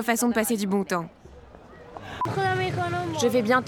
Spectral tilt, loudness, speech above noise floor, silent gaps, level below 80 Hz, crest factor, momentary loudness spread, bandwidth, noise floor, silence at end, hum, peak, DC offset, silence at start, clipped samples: -4.5 dB/octave; -25 LUFS; 23 dB; none; -56 dBFS; 16 dB; 17 LU; 19 kHz; -47 dBFS; 0 s; none; -10 dBFS; under 0.1%; 0 s; under 0.1%